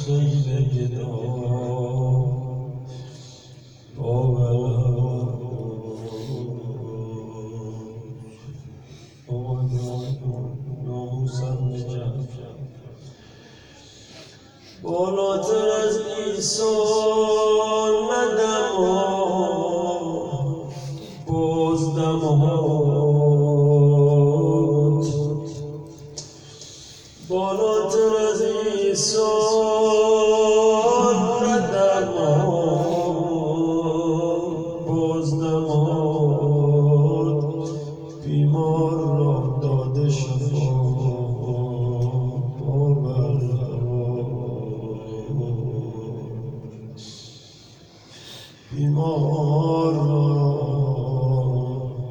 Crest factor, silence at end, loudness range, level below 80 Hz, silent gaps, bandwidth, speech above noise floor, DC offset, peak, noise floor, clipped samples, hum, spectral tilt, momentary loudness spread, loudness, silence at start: 14 dB; 0 s; 12 LU; -48 dBFS; none; 10.5 kHz; 26 dB; under 0.1%; -6 dBFS; -47 dBFS; under 0.1%; none; -6.5 dB/octave; 17 LU; -21 LUFS; 0 s